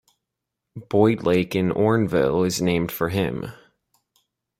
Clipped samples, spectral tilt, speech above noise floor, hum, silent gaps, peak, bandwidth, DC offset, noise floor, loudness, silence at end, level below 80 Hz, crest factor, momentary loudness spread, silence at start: under 0.1%; -6 dB/octave; 62 dB; none; none; -4 dBFS; 16.5 kHz; under 0.1%; -83 dBFS; -21 LUFS; 1.05 s; -54 dBFS; 20 dB; 9 LU; 0.75 s